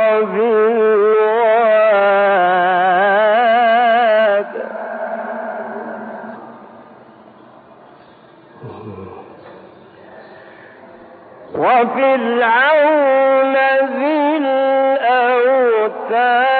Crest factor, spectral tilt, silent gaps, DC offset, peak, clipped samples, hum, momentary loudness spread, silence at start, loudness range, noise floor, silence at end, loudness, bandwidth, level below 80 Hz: 12 dB; -2 dB/octave; none; under 0.1%; -4 dBFS; under 0.1%; none; 17 LU; 0 s; 17 LU; -44 dBFS; 0 s; -14 LUFS; 4.6 kHz; -72 dBFS